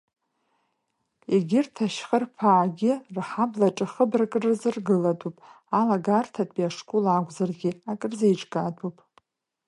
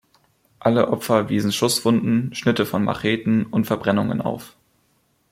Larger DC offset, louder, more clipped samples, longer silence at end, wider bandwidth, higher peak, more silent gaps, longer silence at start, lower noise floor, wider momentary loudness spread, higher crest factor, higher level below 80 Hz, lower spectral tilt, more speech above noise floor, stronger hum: neither; second, -25 LUFS vs -21 LUFS; neither; about the same, 0.75 s vs 0.85 s; second, 11.5 kHz vs 16 kHz; about the same, -6 dBFS vs -4 dBFS; neither; first, 1.3 s vs 0.6 s; first, -77 dBFS vs -65 dBFS; first, 9 LU vs 5 LU; about the same, 18 dB vs 18 dB; second, -74 dBFS vs -56 dBFS; first, -7 dB/octave vs -5.5 dB/octave; first, 52 dB vs 44 dB; neither